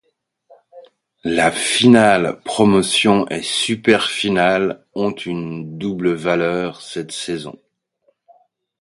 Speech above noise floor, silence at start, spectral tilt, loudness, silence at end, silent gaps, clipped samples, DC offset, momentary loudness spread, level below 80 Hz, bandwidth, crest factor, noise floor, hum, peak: 47 dB; 0.75 s; -4 dB/octave; -17 LUFS; 1.3 s; none; under 0.1%; under 0.1%; 14 LU; -54 dBFS; 11.5 kHz; 18 dB; -64 dBFS; none; 0 dBFS